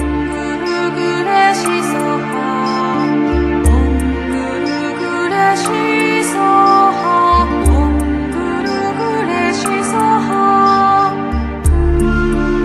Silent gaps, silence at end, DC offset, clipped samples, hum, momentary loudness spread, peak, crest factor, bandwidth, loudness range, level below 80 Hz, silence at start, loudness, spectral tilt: none; 0 s; under 0.1%; under 0.1%; none; 7 LU; 0 dBFS; 14 dB; 13.5 kHz; 3 LU; -22 dBFS; 0 s; -14 LUFS; -5.5 dB/octave